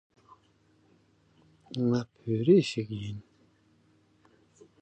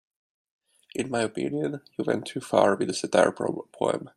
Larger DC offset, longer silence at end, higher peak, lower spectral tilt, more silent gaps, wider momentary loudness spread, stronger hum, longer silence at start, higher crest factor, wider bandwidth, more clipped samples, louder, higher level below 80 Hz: neither; first, 1.6 s vs 0.1 s; second, -10 dBFS vs -4 dBFS; first, -7.5 dB/octave vs -5 dB/octave; neither; first, 18 LU vs 10 LU; neither; first, 1.7 s vs 0.95 s; about the same, 22 dB vs 22 dB; second, 9 kHz vs 13.5 kHz; neither; about the same, -28 LUFS vs -26 LUFS; about the same, -66 dBFS vs -68 dBFS